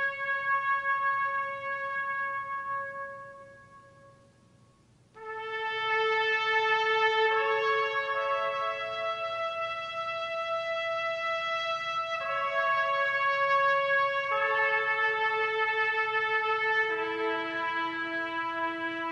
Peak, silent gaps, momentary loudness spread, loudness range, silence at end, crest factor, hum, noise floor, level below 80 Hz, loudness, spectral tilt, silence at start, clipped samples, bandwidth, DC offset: -14 dBFS; none; 8 LU; 9 LU; 0 s; 16 dB; 60 Hz at -65 dBFS; -62 dBFS; -74 dBFS; -28 LUFS; -3 dB/octave; 0 s; under 0.1%; 10.5 kHz; under 0.1%